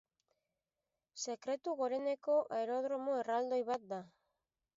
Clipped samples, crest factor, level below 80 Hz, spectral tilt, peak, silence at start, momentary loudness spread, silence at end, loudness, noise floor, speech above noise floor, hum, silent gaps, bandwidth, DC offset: under 0.1%; 16 dB; -88 dBFS; -3 dB/octave; -24 dBFS; 1.15 s; 10 LU; 0.7 s; -38 LUFS; under -90 dBFS; over 53 dB; none; none; 7.6 kHz; under 0.1%